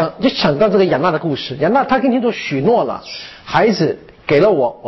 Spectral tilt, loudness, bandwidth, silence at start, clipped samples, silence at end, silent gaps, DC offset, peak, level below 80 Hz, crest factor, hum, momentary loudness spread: -6.5 dB/octave; -15 LUFS; 6.2 kHz; 0 s; under 0.1%; 0 s; none; under 0.1%; -4 dBFS; -48 dBFS; 12 dB; none; 9 LU